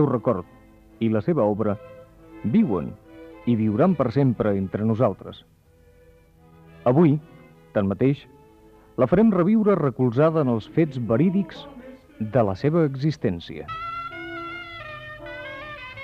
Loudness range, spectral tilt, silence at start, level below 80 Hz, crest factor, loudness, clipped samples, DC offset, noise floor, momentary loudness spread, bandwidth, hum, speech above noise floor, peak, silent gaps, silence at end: 5 LU; -9.5 dB/octave; 0 s; -54 dBFS; 18 dB; -23 LUFS; under 0.1%; under 0.1%; -54 dBFS; 17 LU; 6.6 kHz; none; 33 dB; -6 dBFS; none; 0 s